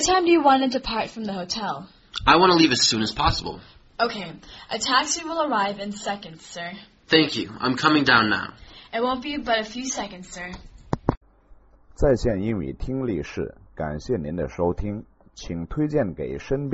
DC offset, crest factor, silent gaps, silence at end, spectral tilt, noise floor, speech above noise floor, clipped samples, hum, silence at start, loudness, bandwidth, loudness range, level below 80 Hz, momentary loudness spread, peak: under 0.1%; 24 dB; 11.17-11.21 s; 0 s; -3 dB/octave; -52 dBFS; 29 dB; under 0.1%; none; 0 s; -23 LUFS; 8 kHz; 8 LU; -40 dBFS; 18 LU; 0 dBFS